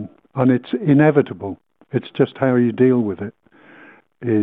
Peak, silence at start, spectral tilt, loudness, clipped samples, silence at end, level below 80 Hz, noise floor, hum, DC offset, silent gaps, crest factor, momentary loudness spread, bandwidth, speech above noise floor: -2 dBFS; 0 s; -10.5 dB/octave; -18 LUFS; under 0.1%; 0 s; -62 dBFS; -47 dBFS; none; under 0.1%; none; 16 dB; 16 LU; 4 kHz; 30 dB